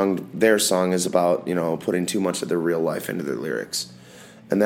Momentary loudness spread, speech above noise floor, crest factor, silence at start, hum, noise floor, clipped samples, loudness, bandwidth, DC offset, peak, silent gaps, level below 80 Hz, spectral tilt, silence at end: 9 LU; 23 dB; 18 dB; 0 s; none; -45 dBFS; under 0.1%; -23 LUFS; 17 kHz; under 0.1%; -4 dBFS; none; -66 dBFS; -4 dB/octave; 0 s